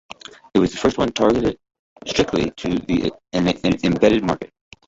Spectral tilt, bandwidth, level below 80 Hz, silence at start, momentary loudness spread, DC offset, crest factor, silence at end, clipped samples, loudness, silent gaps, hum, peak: -5.5 dB/octave; 8 kHz; -42 dBFS; 0.55 s; 16 LU; under 0.1%; 18 dB; 0.4 s; under 0.1%; -20 LUFS; 1.79-1.96 s; none; -2 dBFS